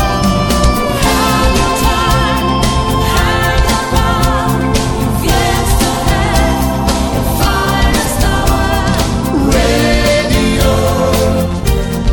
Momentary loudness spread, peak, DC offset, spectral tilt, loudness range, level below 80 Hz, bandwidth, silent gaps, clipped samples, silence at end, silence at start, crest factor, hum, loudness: 3 LU; 0 dBFS; under 0.1%; -5 dB/octave; 1 LU; -16 dBFS; 17.5 kHz; none; under 0.1%; 0 s; 0 s; 10 dB; none; -12 LUFS